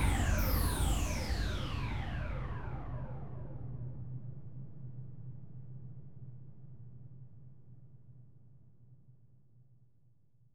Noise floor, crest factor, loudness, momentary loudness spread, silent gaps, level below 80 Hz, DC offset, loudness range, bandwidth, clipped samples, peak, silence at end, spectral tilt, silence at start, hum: -70 dBFS; 20 dB; -39 LUFS; 25 LU; none; -42 dBFS; 0.4%; 21 LU; 19.5 kHz; under 0.1%; -18 dBFS; 0 s; -5 dB/octave; 0 s; none